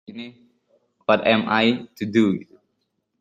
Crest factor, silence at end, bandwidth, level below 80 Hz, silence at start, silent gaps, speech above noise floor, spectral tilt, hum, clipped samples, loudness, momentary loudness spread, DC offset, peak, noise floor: 20 dB; 0.75 s; 7.6 kHz; -64 dBFS; 0.1 s; none; 53 dB; -6.5 dB/octave; none; under 0.1%; -21 LUFS; 19 LU; under 0.1%; -2 dBFS; -74 dBFS